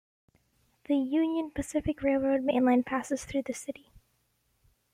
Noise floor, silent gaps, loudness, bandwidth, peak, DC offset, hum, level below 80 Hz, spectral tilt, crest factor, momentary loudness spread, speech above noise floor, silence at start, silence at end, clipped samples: -73 dBFS; none; -29 LUFS; 15 kHz; -14 dBFS; under 0.1%; none; -56 dBFS; -5.5 dB/octave; 16 dB; 11 LU; 45 dB; 0.9 s; 1.2 s; under 0.1%